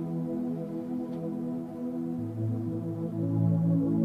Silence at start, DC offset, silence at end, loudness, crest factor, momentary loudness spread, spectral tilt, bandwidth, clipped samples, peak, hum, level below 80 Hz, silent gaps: 0 s; under 0.1%; 0 s; -31 LUFS; 14 dB; 9 LU; -11 dB/octave; 3.5 kHz; under 0.1%; -16 dBFS; none; -66 dBFS; none